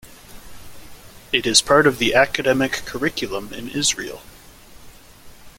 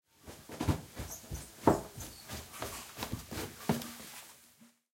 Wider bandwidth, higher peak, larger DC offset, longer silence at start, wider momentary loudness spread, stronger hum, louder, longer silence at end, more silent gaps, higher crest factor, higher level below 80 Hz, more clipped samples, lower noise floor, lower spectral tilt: about the same, 17 kHz vs 16.5 kHz; first, 0 dBFS vs -8 dBFS; neither; second, 0.05 s vs 0.25 s; second, 14 LU vs 18 LU; neither; first, -18 LUFS vs -38 LUFS; second, 0.1 s vs 0.3 s; neither; second, 22 dB vs 30 dB; first, -46 dBFS vs -54 dBFS; neither; second, -44 dBFS vs -63 dBFS; second, -2.5 dB/octave vs -5 dB/octave